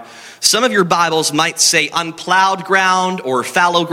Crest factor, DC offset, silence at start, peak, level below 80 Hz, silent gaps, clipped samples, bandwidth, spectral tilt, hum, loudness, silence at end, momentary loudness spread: 14 dB; under 0.1%; 0 s; 0 dBFS; -60 dBFS; none; under 0.1%; 17 kHz; -2 dB/octave; none; -13 LUFS; 0 s; 6 LU